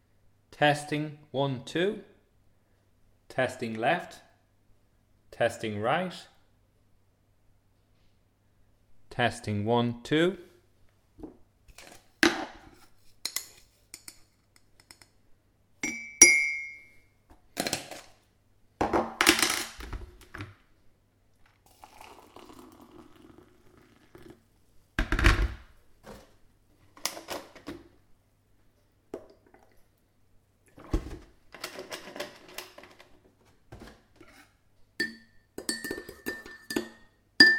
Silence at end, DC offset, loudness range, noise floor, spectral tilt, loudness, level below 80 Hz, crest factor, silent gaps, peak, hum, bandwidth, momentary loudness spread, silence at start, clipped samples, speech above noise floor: 0 s; under 0.1%; 19 LU; -67 dBFS; -2.5 dB/octave; -28 LUFS; -44 dBFS; 32 dB; none; 0 dBFS; none; 19 kHz; 25 LU; 0.5 s; under 0.1%; 38 dB